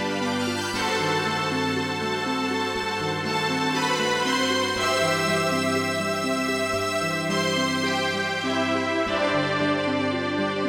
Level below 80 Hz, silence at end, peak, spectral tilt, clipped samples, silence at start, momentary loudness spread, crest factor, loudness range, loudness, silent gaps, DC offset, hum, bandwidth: -58 dBFS; 0 s; -10 dBFS; -3.5 dB/octave; under 0.1%; 0 s; 3 LU; 14 dB; 2 LU; -24 LUFS; none; under 0.1%; none; 19 kHz